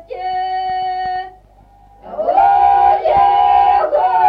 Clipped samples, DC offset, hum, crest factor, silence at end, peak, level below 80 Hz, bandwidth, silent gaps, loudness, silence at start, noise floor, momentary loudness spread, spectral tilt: under 0.1%; under 0.1%; none; 12 dB; 0 s; -2 dBFS; -44 dBFS; 5 kHz; none; -14 LUFS; 0.1 s; -46 dBFS; 12 LU; -5.5 dB/octave